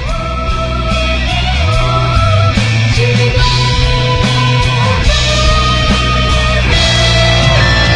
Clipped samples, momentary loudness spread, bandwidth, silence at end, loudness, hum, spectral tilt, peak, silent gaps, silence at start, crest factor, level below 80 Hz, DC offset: under 0.1%; 5 LU; 10.5 kHz; 0 s; -11 LUFS; none; -4.5 dB/octave; 0 dBFS; none; 0 s; 10 dB; -16 dBFS; under 0.1%